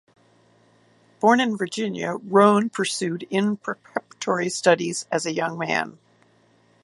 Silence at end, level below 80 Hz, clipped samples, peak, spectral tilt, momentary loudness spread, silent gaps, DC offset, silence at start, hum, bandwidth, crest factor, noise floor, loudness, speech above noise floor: 0.9 s; -72 dBFS; under 0.1%; -2 dBFS; -4.5 dB/octave; 12 LU; none; under 0.1%; 1.2 s; none; 11.5 kHz; 22 dB; -59 dBFS; -22 LUFS; 37 dB